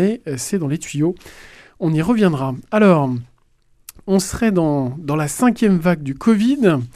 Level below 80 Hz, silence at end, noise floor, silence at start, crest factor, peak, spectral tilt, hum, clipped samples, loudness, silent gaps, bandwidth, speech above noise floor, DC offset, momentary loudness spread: -46 dBFS; 0.05 s; -56 dBFS; 0 s; 16 dB; -2 dBFS; -6.5 dB/octave; none; under 0.1%; -18 LUFS; none; 15 kHz; 39 dB; under 0.1%; 9 LU